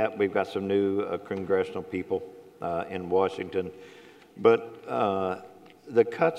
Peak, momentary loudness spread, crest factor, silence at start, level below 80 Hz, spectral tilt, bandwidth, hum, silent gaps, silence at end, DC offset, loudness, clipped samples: -6 dBFS; 11 LU; 22 dB; 0 s; -68 dBFS; -7 dB/octave; 9.6 kHz; none; none; 0 s; under 0.1%; -28 LUFS; under 0.1%